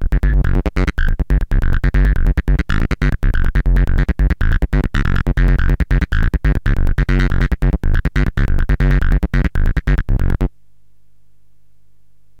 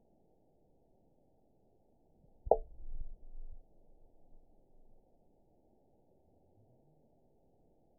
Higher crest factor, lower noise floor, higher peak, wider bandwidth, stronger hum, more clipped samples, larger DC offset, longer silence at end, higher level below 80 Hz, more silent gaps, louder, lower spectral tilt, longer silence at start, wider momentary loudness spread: second, 10 dB vs 36 dB; second, -59 dBFS vs -72 dBFS; first, -4 dBFS vs -10 dBFS; first, 6.6 kHz vs 1 kHz; first, 50 Hz at -35 dBFS vs none; neither; first, 1% vs under 0.1%; second, 1.9 s vs 3.15 s; first, -16 dBFS vs -52 dBFS; neither; first, -18 LUFS vs -34 LUFS; first, -8 dB/octave vs 6.5 dB/octave; second, 0 s vs 2.45 s; second, 3 LU vs 24 LU